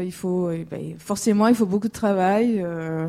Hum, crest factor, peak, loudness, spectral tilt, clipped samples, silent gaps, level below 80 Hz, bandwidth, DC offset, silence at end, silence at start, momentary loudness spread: none; 16 dB; -6 dBFS; -22 LUFS; -6.5 dB/octave; under 0.1%; none; -58 dBFS; 15.5 kHz; under 0.1%; 0 s; 0 s; 11 LU